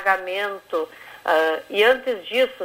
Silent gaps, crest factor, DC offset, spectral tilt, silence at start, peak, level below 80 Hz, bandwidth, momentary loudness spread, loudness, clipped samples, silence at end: none; 16 dB; under 0.1%; -2.5 dB/octave; 0 s; -4 dBFS; -64 dBFS; 16 kHz; 10 LU; -22 LUFS; under 0.1%; 0 s